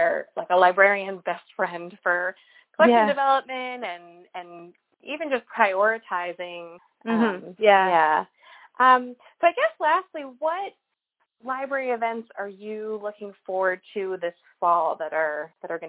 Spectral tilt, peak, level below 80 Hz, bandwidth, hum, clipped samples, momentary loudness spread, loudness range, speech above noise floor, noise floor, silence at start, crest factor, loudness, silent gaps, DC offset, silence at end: -8 dB/octave; -4 dBFS; -80 dBFS; 4 kHz; none; under 0.1%; 18 LU; 8 LU; 51 dB; -75 dBFS; 0 s; 22 dB; -23 LUFS; none; under 0.1%; 0 s